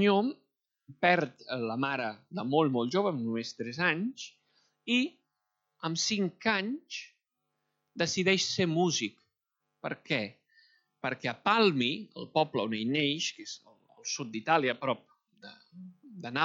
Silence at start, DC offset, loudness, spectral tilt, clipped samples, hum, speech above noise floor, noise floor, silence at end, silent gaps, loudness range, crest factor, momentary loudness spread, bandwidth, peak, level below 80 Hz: 0 s; under 0.1%; -30 LUFS; -4 dB/octave; under 0.1%; none; 54 dB; -84 dBFS; 0 s; none; 3 LU; 22 dB; 17 LU; 8 kHz; -10 dBFS; -80 dBFS